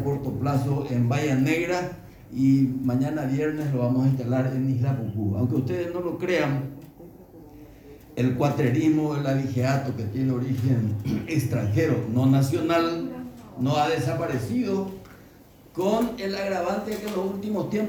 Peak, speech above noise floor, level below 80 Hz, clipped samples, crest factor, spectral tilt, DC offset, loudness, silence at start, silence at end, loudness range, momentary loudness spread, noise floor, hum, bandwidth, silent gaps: -10 dBFS; 27 dB; -54 dBFS; under 0.1%; 16 dB; -7.5 dB/octave; under 0.1%; -25 LUFS; 0 s; 0 s; 4 LU; 7 LU; -50 dBFS; none; 19 kHz; none